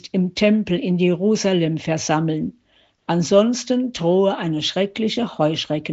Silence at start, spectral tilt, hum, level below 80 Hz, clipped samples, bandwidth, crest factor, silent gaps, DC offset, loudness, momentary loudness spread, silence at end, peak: 0.05 s; -5 dB/octave; none; -58 dBFS; under 0.1%; 8 kHz; 16 dB; none; under 0.1%; -20 LUFS; 6 LU; 0 s; -4 dBFS